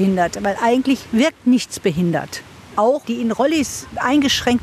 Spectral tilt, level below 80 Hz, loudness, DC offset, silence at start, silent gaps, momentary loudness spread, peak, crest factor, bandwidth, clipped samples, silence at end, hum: -4.5 dB/octave; -48 dBFS; -18 LUFS; under 0.1%; 0 s; none; 8 LU; -4 dBFS; 14 dB; 14 kHz; under 0.1%; 0 s; none